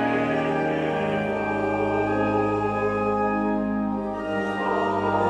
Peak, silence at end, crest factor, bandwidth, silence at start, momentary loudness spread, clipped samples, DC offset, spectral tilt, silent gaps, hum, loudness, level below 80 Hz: -10 dBFS; 0 s; 14 dB; 10 kHz; 0 s; 3 LU; under 0.1%; under 0.1%; -7.5 dB/octave; none; none; -24 LUFS; -48 dBFS